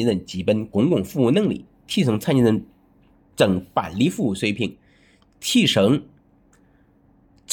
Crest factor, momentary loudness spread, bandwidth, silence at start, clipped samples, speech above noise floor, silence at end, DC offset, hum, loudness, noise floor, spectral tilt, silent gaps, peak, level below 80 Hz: 20 dB; 9 LU; 19.5 kHz; 0 s; under 0.1%; 37 dB; 0 s; under 0.1%; none; -21 LUFS; -57 dBFS; -5.5 dB/octave; none; -2 dBFS; -56 dBFS